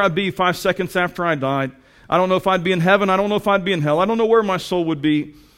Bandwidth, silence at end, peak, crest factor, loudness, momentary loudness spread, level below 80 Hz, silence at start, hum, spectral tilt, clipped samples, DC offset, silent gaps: 16.5 kHz; 0.25 s; -2 dBFS; 16 dB; -18 LUFS; 6 LU; -50 dBFS; 0 s; none; -6 dB/octave; under 0.1%; under 0.1%; none